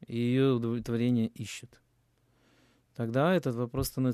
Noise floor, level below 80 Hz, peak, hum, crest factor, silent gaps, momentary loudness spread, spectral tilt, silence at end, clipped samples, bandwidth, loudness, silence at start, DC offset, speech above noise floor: -70 dBFS; -56 dBFS; -14 dBFS; none; 16 dB; none; 14 LU; -6.5 dB/octave; 0 s; under 0.1%; 14 kHz; -30 LUFS; 0.1 s; under 0.1%; 41 dB